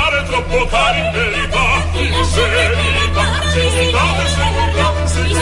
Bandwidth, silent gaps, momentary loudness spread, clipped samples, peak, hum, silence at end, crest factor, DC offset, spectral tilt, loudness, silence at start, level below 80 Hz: 11.5 kHz; none; 3 LU; under 0.1%; -2 dBFS; none; 0 s; 14 dB; under 0.1%; -4 dB/octave; -14 LUFS; 0 s; -22 dBFS